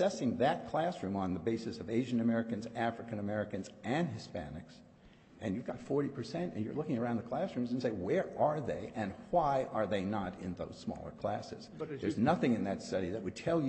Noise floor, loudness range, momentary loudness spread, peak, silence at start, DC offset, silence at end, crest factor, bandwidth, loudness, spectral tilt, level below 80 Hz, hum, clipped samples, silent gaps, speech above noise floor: -60 dBFS; 5 LU; 10 LU; -16 dBFS; 0 s; under 0.1%; 0 s; 20 dB; 8.4 kHz; -36 LUFS; -7 dB/octave; -64 dBFS; none; under 0.1%; none; 25 dB